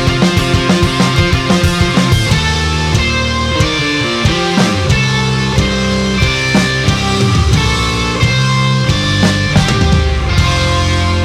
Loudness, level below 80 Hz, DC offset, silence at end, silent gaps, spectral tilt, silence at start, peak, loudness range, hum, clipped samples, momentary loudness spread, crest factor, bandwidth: -12 LUFS; -22 dBFS; under 0.1%; 0 s; none; -5 dB/octave; 0 s; 0 dBFS; 1 LU; none; under 0.1%; 2 LU; 12 dB; 15 kHz